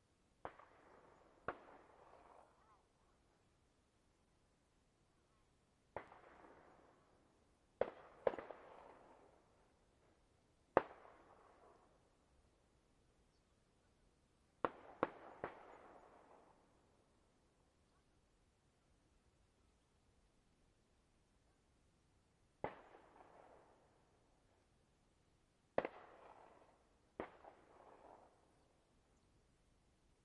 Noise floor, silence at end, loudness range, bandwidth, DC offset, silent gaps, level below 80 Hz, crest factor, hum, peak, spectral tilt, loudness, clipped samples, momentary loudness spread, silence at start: -78 dBFS; 1.95 s; 15 LU; 10.5 kHz; under 0.1%; none; -80 dBFS; 42 dB; none; -12 dBFS; -6.5 dB/octave; -48 LUFS; under 0.1%; 23 LU; 0.45 s